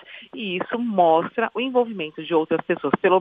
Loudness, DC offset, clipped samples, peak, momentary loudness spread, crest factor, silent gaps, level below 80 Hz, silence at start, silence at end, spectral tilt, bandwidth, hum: -22 LUFS; under 0.1%; under 0.1%; -2 dBFS; 11 LU; 20 dB; none; -66 dBFS; 0.1 s; 0 s; -8.5 dB/octave; 3.9 kHz; none